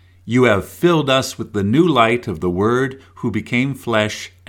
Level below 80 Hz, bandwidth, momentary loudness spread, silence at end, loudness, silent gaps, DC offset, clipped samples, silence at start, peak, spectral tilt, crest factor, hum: -50 dBFS; 17 kHz; 9 LU; 0.2 s; -17 LUFS; none; under 0.1%; under 0.1%; 0.25 s; 0 dBFS; -5.5 dB/octave; 18 dB; none